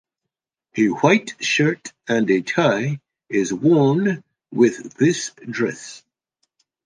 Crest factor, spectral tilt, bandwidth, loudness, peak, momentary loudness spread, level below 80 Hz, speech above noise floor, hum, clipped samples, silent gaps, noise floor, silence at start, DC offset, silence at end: 18 dB; -5.5 dB/octave; 10 kHz; -20 LUFS; -2 dBFS; 14 LU; -66 dBFS; 65 dB; none; under 0.1%; none; -84 dBFS; 0.75 s; under 0.1%; 0.9 s